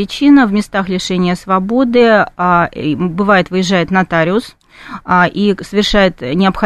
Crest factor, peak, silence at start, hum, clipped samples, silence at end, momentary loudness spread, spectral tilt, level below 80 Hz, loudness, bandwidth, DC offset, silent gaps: 12 dB; 0 dBFS; 0 s; none; under 0.1%; 0 s; 7 LU; -6 dB/octave; -36 dBFS; -12 LUFS; 12.5 kHz; under 0.1%; none